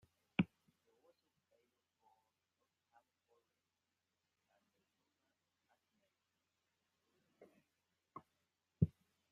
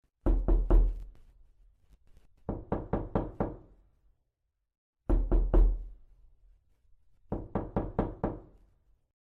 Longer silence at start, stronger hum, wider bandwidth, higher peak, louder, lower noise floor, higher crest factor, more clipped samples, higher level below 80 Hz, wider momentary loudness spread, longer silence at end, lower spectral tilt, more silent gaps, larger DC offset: first, 0.4 s vs 0.25 s; neither; first, 5.4 kHz vs 2.8 kHz; second, -20 dBFS vs -12 dBFS; second, -42 LUFS vs -33 LUFS; first, -90 dBFS vs -82 dBFS; first, 30 dB vs 20 dB; neither; second, -74 dBFS vs -32 dBFS; first, 20 LU vs 17 LU; second, 0.45 s vs 0.8 s; second, -9 dB/octave vs -11 dB/octave; second, none vs 4.78-4.93 s; neither